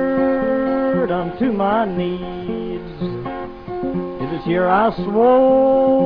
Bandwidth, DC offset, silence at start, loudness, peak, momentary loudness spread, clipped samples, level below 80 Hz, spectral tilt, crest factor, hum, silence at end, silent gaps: 5.2 kHz; under 0.1%; 0 s; -18 LUFS; -4 dBFS; 13 LU; under 0.1%; -42 dBFS; -10 dB/octave; 14 dB; none; 0 s; none